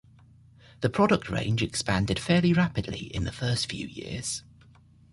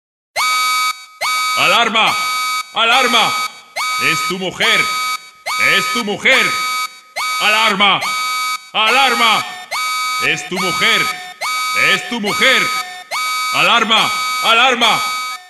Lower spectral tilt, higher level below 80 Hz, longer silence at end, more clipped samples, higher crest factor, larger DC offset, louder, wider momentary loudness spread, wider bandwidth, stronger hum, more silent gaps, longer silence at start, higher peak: first, -5 dB/octave vs -1 dB/octave; first, -48 dBFS vs -62 dBFS; first, 0.75 s vs 0 s; neither; about the same, 20 dB vs 16 dB; neither; second, -27 LUFS vs -14 LUFS; about the same, 11 LU vs 9 LU; second, 11.5 kHz vs 13.5 kHz; neither; neither; first, 0.8 s vs 0.35 s; second, -8 dBFS vs 0 dBFS